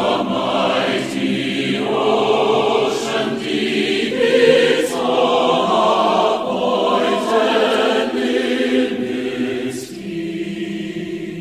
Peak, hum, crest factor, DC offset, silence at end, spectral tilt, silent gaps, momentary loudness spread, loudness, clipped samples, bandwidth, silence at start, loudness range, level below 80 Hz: 0 dBFS; none; 16 dB; under 0.1%; 0 s; -4.5 dB/octave; none; 10 LU; -17 LUFS; under 0.1%; 15 kHz; 0 s; 4 LU; -56 dBFS